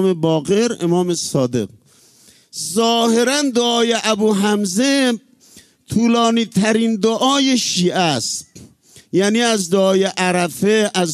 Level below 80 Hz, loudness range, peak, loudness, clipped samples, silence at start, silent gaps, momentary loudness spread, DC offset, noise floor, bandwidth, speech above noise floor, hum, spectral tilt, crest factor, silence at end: -58 dBFS; 2 LU; -2 dBFS; -16 LUFS; under 0.1%; 0 s; none; 7 LU; under 0.1%; -51 dBFS; 14 kHz; 35 dB; none; -4 dB/octave; 14 dB; 0 s